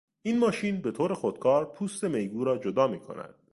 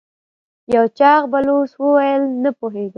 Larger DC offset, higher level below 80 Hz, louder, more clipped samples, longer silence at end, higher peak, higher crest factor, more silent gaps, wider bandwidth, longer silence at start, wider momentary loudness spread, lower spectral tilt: neither; second, -68 dBFS vs -58 dBFS; second, -28 LUFS vs -16 LUFS; neither; first, 0.2 s vs 0.05 s; second, -10 dBFS vs 0 dBFS; about the same, 18 dB vs 16 dB; neither; first, 11.5 kHz vs 6 kHz; second, 0.25 s vs 0.7 s; about the same, 8 LU vs 8 LU; about the same, -6 dB/octave vs -7 dB/octave